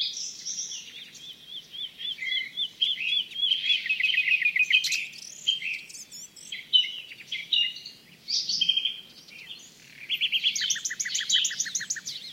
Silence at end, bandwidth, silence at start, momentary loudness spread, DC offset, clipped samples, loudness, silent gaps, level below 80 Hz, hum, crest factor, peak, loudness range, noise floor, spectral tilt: 0 s; 16.5 kHz; 0 s; 20 LU; under 0.1%; under 0.1%; -25 LUFS; none; -78 dBFS; none; 22 dB; -8 dBFS; 5 LU; -48 dBFS; 3 dB/octave